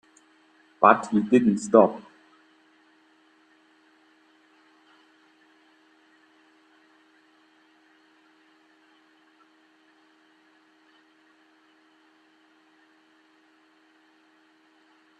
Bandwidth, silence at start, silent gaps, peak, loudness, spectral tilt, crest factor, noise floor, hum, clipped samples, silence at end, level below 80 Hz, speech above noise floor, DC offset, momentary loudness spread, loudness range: 9.6 kHz; 0.8 s; none; -2 dBFS; -20 LUFS; -6.5 dB/octave; 28 dB; -61 dBFS; none; under 0.1%; 13.2 s; -74 dBFS; 42 dB; under 0.1%; 5 LU; 5 LU